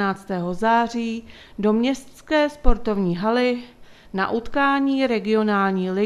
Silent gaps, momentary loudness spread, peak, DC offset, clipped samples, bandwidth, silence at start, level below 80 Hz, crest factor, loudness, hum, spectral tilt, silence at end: none; 9 LU; 0 dBFS; under 0.1%; under 0.1%; 12 kHz; 0 s; -32 dBFS; 20 dB; -22 LUFS; none; -6.5 dB/octave; 0 s